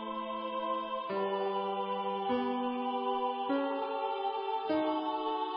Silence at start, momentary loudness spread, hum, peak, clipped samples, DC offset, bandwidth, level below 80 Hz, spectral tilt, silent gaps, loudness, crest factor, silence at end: 0 s; 3 LU; none; -20 dBFS; under 0.1%; under 0.1%; 5.6 kHz; -76 dBFS; -2.5 dB/octave; none; -34 LUFS; 14 dB; 0 s